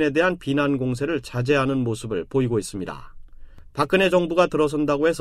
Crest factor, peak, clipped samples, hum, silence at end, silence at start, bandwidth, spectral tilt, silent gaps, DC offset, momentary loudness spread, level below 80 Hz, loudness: 16 dB; -6 dBFS; under 0.1%; none; 0 s; 0 s; 14.5 kHz; -6 dB/octave; none; under 0.1%; 11 LU; -46 dBFS; -22 LUFS